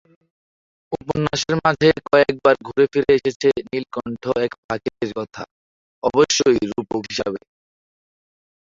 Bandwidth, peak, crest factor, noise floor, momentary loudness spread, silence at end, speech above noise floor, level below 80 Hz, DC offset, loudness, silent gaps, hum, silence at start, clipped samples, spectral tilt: 7.6 kHz; -2 dBFS; 18 dB; under -90 dBFS; 14 LU; 1.3 s; over 71 dB; -52 dBFS; under 0.1%; -19 LUFS; 3.36-3.40 s, 4.58-4.69 s, 5.51-6.02 s; none; 0.9 s; under 0.1%; -4.5 dB/octave